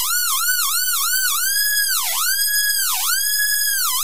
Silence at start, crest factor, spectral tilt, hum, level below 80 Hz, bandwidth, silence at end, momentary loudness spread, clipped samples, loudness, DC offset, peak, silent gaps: 0 s; 14 dB; 4.5 dB/octave; none; -68 dBFS; 16 kHz; 0 s; 1 LU; under 0.1%; -16 LUFS; 3%; -4 dBFS; none